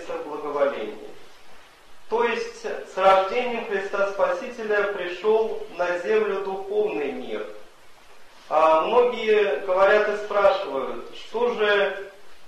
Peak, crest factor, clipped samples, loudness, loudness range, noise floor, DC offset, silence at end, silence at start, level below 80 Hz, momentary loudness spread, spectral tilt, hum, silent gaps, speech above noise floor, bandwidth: -6 dBFS; 18 dB; under 0.1%; -23 LUFS; 5 LU; -47 dBFS; under 0.1%; 0 s; 0 s; -62 dBFS; 14 LU; -4 dB/octave; none; none; 25 dB; 12 kHz